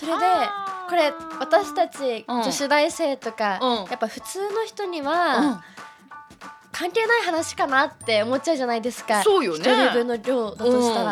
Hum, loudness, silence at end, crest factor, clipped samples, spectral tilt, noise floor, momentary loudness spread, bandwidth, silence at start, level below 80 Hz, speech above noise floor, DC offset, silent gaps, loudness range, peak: none; -22 LUFS; 0 s; 18 dB; under 0.1%; -3 dB/octave; -45 dBFS; 10 LU; 16 kHz; 0 s; -66 dBFS; 22 dB; under 0.1%; none; 4 LU; -4 dBFS